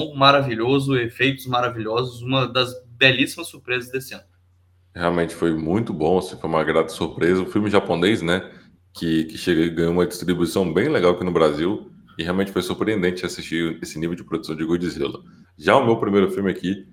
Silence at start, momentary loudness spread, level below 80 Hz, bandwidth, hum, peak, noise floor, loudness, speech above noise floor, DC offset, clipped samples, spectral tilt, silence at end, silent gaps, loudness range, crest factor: 0 s; 11 LU; -52 dBFS; 17 kHz; none; 0 dBFS; -58 dBFS; -21 LUFS; 37 dB; under 0.1%; under 0.1%; -5.5 dB/octave; 0.1 s; none; 4 LU; 22 dB